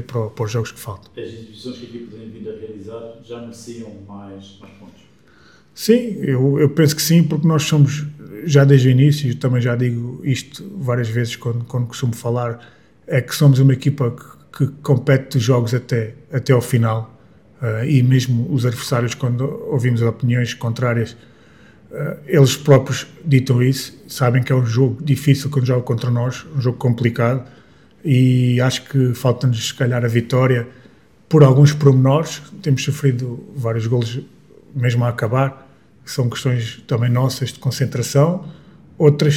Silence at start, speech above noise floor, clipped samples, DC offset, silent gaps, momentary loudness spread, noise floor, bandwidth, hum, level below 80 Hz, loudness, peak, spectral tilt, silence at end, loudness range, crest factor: 0 s; 33 dB; under 0.1%; 0.2%; none; 19 LU; -50 dBFS; 15.5 kHz; none; -56 dBFS; -17 LUFS; 0 dBFS; -6.5 dB/octave; 0 s; 8 LU; 18 dB